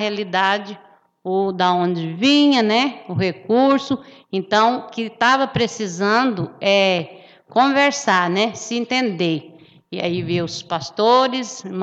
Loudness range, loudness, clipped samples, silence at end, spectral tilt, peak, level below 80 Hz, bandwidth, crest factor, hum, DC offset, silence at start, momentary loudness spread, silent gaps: 3 LU; -19 LUFS; under 0.1%; 0 s; -4.5 dB/octave; -2 dBFS; -60 dBFS; 8.2 kHz; 18 dB; none; under 0.1%; 0 s; 11 LU; none